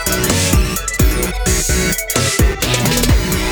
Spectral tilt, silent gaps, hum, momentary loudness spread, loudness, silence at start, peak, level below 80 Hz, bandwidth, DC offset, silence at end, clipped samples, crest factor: -3.5 dB/octave; none; none; 2 LU; -15 LUFS; 0 s; 0 dBFS; -20 dBFS; over 20 kHz; under 0.1%; 0 s; under 0.1%; 14 dB